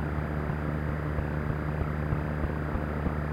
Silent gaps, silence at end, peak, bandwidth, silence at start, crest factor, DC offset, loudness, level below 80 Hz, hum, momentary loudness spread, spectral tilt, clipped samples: none; 0 s; -14 dBFS; 5.2 kHz; 0 s; 16 dB; under 0.1%; -31 LUFS; -36 dBFS; none; 1 LU; -9 dB/octave; under 0.1%